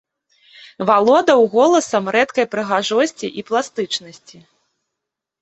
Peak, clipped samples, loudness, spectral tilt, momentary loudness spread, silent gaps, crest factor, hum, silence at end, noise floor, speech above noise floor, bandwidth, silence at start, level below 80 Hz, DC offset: -2 dBFS; under 0.1%; -17 LUFS; -3.5 dB/octave; 11 LU; none; 16 dB; none; 1.3 s; -82 dBFS; 65 dB; 8.4 kHz; 0.8 s; -64 dBFS; under 0.1%